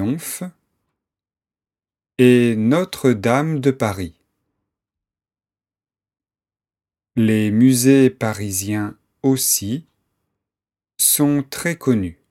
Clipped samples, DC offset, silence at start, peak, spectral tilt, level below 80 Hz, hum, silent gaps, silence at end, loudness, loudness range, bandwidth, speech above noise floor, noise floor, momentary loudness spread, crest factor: under 0.1%; under 0.1%; 0 s; 0 dBFS; -5 dB/octave; -56 dBFS; none; none; 0.2 s; -17 LUFS; 8 LU; 17 kHz; over 73 dB; under -90 dBFS; 15 LU; 18 dB